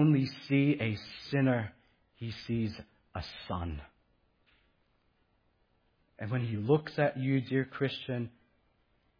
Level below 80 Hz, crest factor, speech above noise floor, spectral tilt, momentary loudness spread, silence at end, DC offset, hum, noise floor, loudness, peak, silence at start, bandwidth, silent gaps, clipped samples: -58 dBFS; 20 dB; 41 dB; -8.5 dB/octave; 15 LU; 0.9 s; under 0.1%; none; -72 dBFS; -33 LUFS; -14 dBFS; 0 s; 5.2 kHz; none; under 0.1%